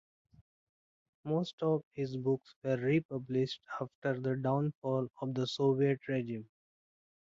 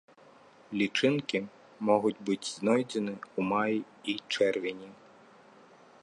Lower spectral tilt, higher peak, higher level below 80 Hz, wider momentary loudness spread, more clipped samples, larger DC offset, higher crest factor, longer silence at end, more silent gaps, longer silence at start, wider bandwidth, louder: first, -7.5 dB/octave vs -5 dB/octave; second, -18 dBFS vs -10 dBFS; about the same, -74 dBFS vs -76 dBFS; about the same, 8 LU vs 10 LU; neither; neither; second, 16 dB vs 22 dB; second, 0.85 s vs 1.1 s; first, 1.53-1.58 s, 1.83-1.91 s, 2.56-2.62 s, 3.05-3.09 s, 3.95-4.02 s, 4.75-4.82 s vs none; first, 1.25 s vs 0.7 s; second, 7.6 kHz vs 11.5 kHz; second, -35 LUFS vs -30 LUFS